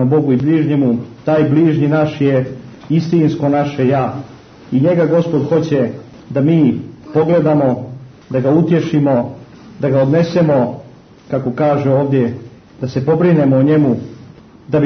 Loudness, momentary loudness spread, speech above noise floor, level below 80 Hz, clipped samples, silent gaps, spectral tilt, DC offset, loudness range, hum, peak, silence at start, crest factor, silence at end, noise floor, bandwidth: -14 LUFS; 11 LU; 26 dB; -52 dBFS; under 0.1%; none; -9 dB/octave; under 0.1%; 1 LU; none; -2 dBFS; 0 s; 12 dB; 0 s; -39 dBFS; 6.4 kHz